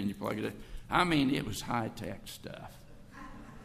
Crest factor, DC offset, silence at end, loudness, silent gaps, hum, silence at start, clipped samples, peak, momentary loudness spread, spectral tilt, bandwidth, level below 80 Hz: 22 dB; under 0.1%; 0 s; -33 LUFS; none; none; 0 s; under 0.1%; -12 dBFS; 21 LU; -5 dB/octave; 15.5 kHz; -52 dBFS